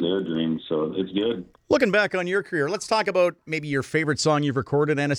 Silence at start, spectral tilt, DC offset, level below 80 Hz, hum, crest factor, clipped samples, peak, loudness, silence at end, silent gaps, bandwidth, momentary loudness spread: 0 s; -5 dB/octave; under 0.1%; -62 dBFS; none; 18 dB; under 0.1%; -4 dBFS; -24 LUFS; 0 s; none; 13.5 kHz; 6 LU